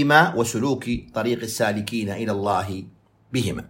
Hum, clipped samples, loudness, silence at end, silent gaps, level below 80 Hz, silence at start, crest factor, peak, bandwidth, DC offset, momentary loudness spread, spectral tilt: none; under 0.1%; -23 LUFS; 0.05 s; none; -50 dBFS; 0 s; 22 dB; -2 dBFS; 16.5 kHz; under 0.1%; 9 LU; -5 dB/octave